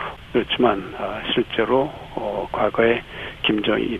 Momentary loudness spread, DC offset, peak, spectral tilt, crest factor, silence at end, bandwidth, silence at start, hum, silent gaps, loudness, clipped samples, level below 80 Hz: 9 LU; under 0.1%; -4 dBFS; -6.5 dB/octave; 18 dB; 0 s; 9.6 kHz; 0 s; none; none; -22 LUFS; under 0.1%; -46 dBFS